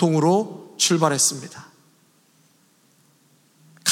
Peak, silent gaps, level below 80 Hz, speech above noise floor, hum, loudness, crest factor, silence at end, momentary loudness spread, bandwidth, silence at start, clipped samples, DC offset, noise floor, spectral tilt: -4 dBFS; none; -82 dBFS; 40 dB; none; -20 LUFS; 20 dB; 0 s; 19 LU; 17 kHz; 0 s; under 0.1%; under 0.1%; -60 dBFS; -3.5 dB/octave